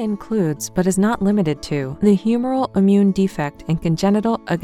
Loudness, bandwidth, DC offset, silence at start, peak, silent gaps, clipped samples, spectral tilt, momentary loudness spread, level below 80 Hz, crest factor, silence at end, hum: -19 LUFS; 14 kHz; under 0.1%; 0 s; -4 dBFS; none; under 0.1%; -6.5 dB/octave; 7 LU; -46 dBFS; 14 dB; 0 s; none